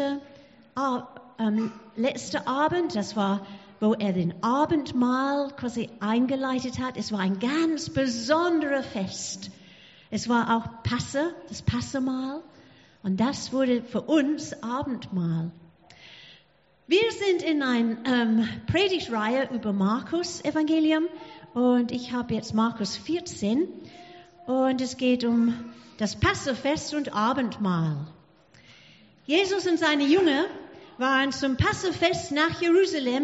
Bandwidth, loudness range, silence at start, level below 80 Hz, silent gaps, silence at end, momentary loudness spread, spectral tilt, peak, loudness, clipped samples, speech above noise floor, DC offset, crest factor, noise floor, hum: 8 kHz; 4 LU; 0 s; -54 dBFS; none; 0 s; 10 LU; -4 dB/octave; -8 dBFS; -26 LUFS; under 0.1%; 37 dB; under 0.1%; 18 dB; -62 dBFS; none